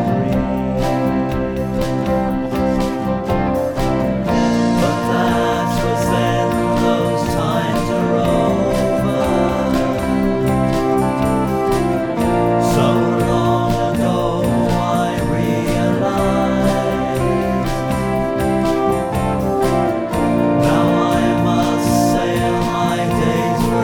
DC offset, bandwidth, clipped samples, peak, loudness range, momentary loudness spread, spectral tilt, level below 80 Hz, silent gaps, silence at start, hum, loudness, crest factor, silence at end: under 0.1%; 19 kHz; under 0.1%; -2 dBFS; 2 LU; 4 LU; -6.5 dB/octave; -32 dBFS; none; 0 s; none; -17 LUFS; 14 dB; 0 s